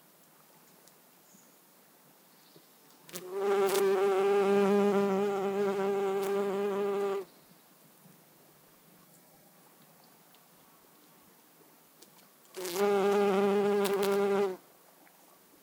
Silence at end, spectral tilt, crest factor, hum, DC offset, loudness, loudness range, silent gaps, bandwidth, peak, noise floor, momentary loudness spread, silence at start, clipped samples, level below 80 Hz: 1.05 s; -5.5 dB/octave; 24 dB; none; under 0.1%; -29 LUFS; 11 LU; none; 18 kHz; -8 dBFS; -61 dBFS; 13 LU; 3.15 s; under 0.1%; -88 dBFS